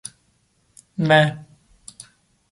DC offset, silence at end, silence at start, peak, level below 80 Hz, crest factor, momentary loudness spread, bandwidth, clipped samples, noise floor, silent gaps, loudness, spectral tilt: under 0.1%; 1.1 s; 1 s; -2 dBFS; -62 dBFS; 22 dB; 25 LU; 11.5 kHz; under 0.1%; -64 dBFS; none; -18 LUFS; -5.5 dB/octave